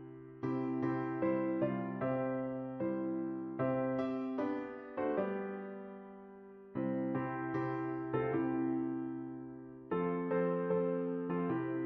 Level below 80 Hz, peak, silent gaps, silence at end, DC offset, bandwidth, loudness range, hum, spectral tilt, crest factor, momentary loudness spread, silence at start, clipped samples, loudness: -72 dBFS; -22 dBFS; none; 0 s; under 0.1%; 5.2 kHz; 3 LU; none; -8 dB/octave; 14 dB; 12 LU; 0 s; under 0.1%; -37 LUFS